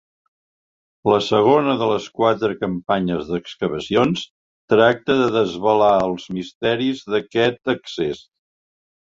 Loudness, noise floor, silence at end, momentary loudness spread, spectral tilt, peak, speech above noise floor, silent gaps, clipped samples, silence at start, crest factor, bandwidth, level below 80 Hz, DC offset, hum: -19 LUFS; under -90 dBFS; 1 s; 10 LU; -6 dB/octave; -2 dBFS; over 71 dB; 4.30-4.68 s, 6.55-6.61 s; under 0.1%; 1.05 s; 18 dB; 7.6 kHz; -54 dBFS; under 0.1%; none